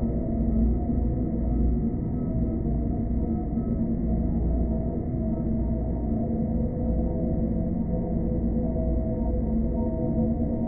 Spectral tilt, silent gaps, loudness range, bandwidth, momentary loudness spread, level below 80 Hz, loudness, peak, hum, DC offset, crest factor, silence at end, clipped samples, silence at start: -16 dB/octave; none; 1 LU; 2.2 kHz; 2 LU; -30 dBFS; -27 LUFS; -14 dBFS; none; under 0.1%; 12 dB; 0 s; under 0.1%; 0 s